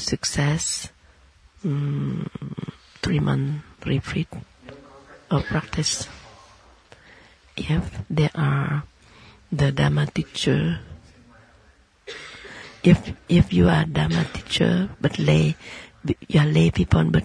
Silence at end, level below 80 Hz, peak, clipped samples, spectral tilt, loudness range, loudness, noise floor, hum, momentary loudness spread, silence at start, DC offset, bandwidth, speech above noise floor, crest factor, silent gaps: 0 s; -40 dBFS; -4 dBFS; under 0.1%; -5.5 dB/octave; 7 LU; -23 LUFS; -56 dBFS; none; 17 LU; 0 s; under 0.1%; 11 kHz; 35 dB; 20 dB; none